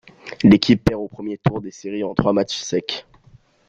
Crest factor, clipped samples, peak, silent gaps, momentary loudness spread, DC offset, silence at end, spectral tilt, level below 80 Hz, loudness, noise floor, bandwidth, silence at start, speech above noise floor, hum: 20 dB; under 0.1%; 0 dBFS; none; 15 LU; under 0.1%; 0.65 s; -6 dB/octave; -44 dBFS; -19 LUFS; -52 dBFS; 7.8 kHz; 0.25 s; 33 dB; none